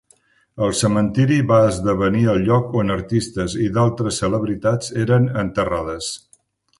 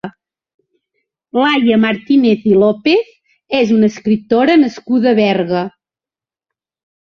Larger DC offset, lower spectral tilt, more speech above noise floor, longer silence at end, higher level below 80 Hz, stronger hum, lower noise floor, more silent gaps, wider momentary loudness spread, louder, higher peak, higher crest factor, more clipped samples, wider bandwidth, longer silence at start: neither; about the same, -6 dB/octave vs -6.5 dB/octave; second, 40 dB vs over 78 dB; second, 0.6 s vs 1.3 s; first, -42 dBFS vs -56 dBFS; neither; second, -58 dBFS vs under -90 dBFS; second, none vs 0.54-0.59 s; about the same, 8 LU vs 8 LU; second, -19 LUFS vs -13 LUFS; about the same, -2 dBFS vs 0 dBFS; about the same, 18 dB vs 14 dB; neither; first, 11.5 kHz vs 6.8 kHz; first, 0.55 s vs 0.05 s